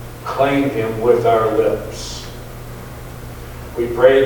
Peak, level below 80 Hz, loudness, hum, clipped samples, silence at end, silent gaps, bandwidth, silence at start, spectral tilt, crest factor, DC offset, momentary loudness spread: 0 dBFS; -38 dBFS; -17 LUFS; none; under 0.1%; 0 s; none; 19 kHz; 0 s; -6 dB/octave; 18 dB; under 0.1%; 19 LU